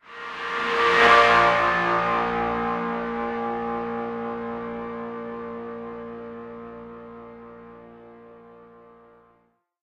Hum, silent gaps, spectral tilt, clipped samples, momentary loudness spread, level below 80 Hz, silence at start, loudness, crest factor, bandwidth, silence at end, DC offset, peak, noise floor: none; none; -4.5 dB/octave; under 0.1%; 25 LU; -54 dBFS; 0.05 s; -22 LUFS; 20 dB; 11.5 kHz; 1.2 s; under 0.1%; -4 dBFS; -66 dBFS